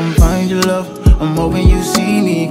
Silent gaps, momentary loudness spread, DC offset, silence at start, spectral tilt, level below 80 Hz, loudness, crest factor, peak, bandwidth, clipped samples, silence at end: none; 3 LU; under 0.1%; 0 s; -6 dB/octave; -16 dBFS; -13 LUFS; 12 dB; 0 dBFS; 16 kHz; under 0.1%; 0 s